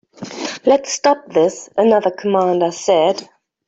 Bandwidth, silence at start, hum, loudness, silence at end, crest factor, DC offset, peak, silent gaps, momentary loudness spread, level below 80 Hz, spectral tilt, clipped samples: 8 kHz; 0.2 s; none; -16 LUFS; 0.45 s; 14 dB; under 0.1%; -2 dBFS; none; 11 LU; -62 dBFS; -4 dB/octave; under 0.1%